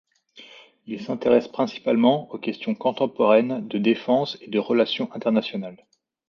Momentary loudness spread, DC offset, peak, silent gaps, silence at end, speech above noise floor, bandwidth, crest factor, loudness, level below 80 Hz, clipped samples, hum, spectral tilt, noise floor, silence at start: 12 LU; under 0.1%; -4 dBFS; none; 0.55 s; 27 dB; 6.8 kHz; 18 dB; -23 LUFS; -70 dBFS; under 0.1%; none; -7 dB/octave; -49 dBFS; 0.35 s